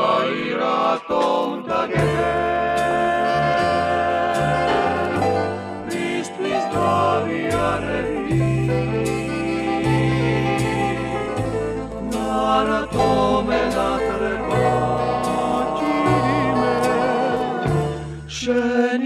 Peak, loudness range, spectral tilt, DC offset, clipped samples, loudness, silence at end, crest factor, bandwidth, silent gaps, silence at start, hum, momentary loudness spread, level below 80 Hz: -4 dBFS; 2 LU; -6 dB/octave; under 0.1%; under 0.1%; -20 LUFS; 0 s; 16 dB; 14 kHz; none; 0 s; none; 5 LU; -40 dBFS